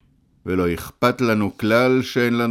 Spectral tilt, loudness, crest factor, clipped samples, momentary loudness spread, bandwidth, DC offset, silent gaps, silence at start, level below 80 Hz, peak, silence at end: -6 dB/octave; -20 LUFS; 16 dB; under 0.1%; 7 LU; 16.5 kHz; under 0.1%; none; 0.45 s; -48 dBFS; -4 dBFS; 0 s